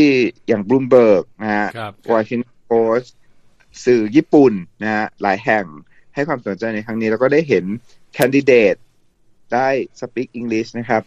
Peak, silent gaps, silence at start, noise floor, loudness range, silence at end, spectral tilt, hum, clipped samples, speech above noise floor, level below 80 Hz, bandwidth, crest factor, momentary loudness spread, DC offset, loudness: 0 dBFS; none; 0 s; -53 dBFS; 2 LU; 0.05 s; -6.5 dB/octave; none; under 0.1%; 37 dB; -58 dBFS; 14 kHz; 16 dB; 13 LU; under 0.1%; -17 LUFS